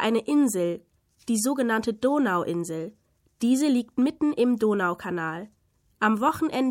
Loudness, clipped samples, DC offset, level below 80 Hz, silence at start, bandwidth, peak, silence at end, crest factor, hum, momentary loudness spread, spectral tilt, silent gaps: -25 LUFS; under 0.1%; under 0.1%; -66 dBFS; 0 s; 16.5 kHz; -10 dBFS; 0 s; 16 dB; none; 10 LU; -5 dB/octave; none